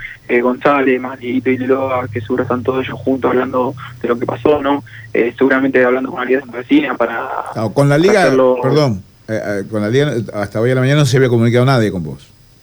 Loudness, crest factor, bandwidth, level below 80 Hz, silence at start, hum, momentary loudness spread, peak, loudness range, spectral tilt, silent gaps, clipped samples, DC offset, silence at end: -15 LUFS; 12 dB; over 20 kHz; -48 dBFS; 0 s; none; 9 LU; -2 dBFS; 3 LU; -7 dB/octave; none; under 0.1%; under 0.1%; 0.45 s